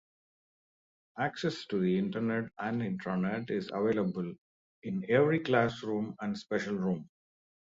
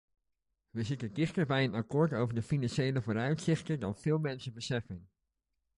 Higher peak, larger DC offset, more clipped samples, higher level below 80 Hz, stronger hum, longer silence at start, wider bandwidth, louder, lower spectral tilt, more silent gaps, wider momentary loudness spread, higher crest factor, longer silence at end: about the same, -14 dBFS vs -16 dBFS; neither; neither; second, -70 dBFS vs -62 dBFS; neither; first, 1.15 s vs 0.75 s; second, 7.8 kHz vs 11.5 kHz; about the same, -32 LUFS vs -33 LUFS; about the same, -7 dB/octave vs -6.5 dB/octave; first, 4.38-4.82 s vs none; first, 11 LU vs 8 LU; about the same, 20 dB vs 18 dB; about the same, 0.6 s vs 0.7 s